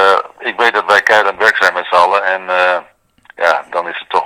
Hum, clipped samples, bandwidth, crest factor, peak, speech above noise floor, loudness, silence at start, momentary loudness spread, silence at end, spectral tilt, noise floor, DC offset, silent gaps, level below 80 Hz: none; 0.8%; over 20 kHz; 14 dB; 0 dBFS; 20 dB; -12 LUFS; 0 s; 9 LU; 0 s; -1.5 dB/octave; -32 dBFS; under 0.1%; none; -60 dBFS